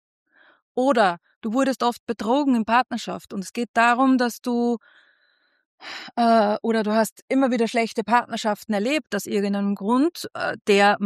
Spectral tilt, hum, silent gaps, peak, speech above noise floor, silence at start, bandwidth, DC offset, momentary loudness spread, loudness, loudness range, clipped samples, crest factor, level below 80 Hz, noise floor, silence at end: -5 dB/octave; none; 1.36-1.41 s, 2.00-2.07 s, 3.68-3.74 s, 5.66-5.78 s, 7.12-7.16 s, 7.22-7.28 s; -4 dBFS; 44 dB; 0.75 s; 14 kHz; under 0.1%; 12 LU; -22 LUFS; 2 LU; under 0.1%; 18 dB; -70 dBFS; -65 dBFS; 0 s